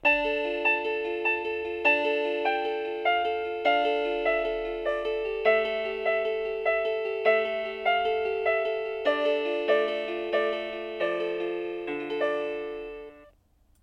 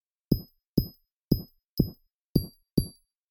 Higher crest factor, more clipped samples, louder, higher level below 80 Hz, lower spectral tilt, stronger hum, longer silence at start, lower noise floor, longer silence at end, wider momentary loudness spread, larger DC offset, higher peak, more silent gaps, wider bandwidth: second, 18 dB vs 24 dB; neither; first, -27 LUFS vs -31 LUFS; second, -58 dBFS vs -42 dBFS; second, -4.5 dB/octave vs -8 dB/octave; neither; second, 0.05 s vs 0.3 s; first, -63 dBFS vs -46 dBFS; first, 0.6 s vs 0.4 s; first, 7 LU vs 4 LU; neither; second, -10 dBFS vs -6 dBFS; second, none vs 0.67-0.74 s, 1.11-1.28 s, 1.68-1.77 s, 2.13-2.35 s, 2.73-2.77 s; second, 6.8 kHz vs 19 kHz